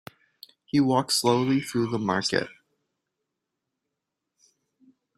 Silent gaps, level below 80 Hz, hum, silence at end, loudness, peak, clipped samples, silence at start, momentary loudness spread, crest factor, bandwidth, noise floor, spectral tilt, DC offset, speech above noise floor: none; -66 dBFS; none; 2.65 s; -24 LUFS; -6 dBFS; under 0.1%; 0.75 s; 5 LU; 22 dB; 15.5 kHz; -84 dBFS; -4.5 dB/octave; under 0.1%; 60 dB